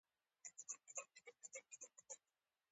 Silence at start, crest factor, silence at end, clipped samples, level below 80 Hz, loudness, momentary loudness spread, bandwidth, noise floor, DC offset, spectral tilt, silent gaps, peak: 0.45 s; 28 dB; 0.55 s; under 0.1%; under -90 dBFS; -56 LUFS; 9 LU; 8.8 kHz; under -90 dBFS; under 0.1%; 2 dB/octave; none; -32 dBFS